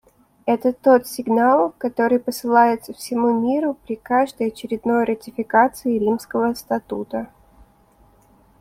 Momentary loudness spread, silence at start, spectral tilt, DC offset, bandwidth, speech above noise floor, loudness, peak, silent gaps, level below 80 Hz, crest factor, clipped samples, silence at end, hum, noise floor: 11 LU; 0.45 s; -5.5 dB/octave; under 0.1%; 16 kHz; 35 dB; -20 LUFS; -4 dBFS; none; -58 dBFS; 18 dB; under 0.1%; 1.35 s; none; -55 dBFS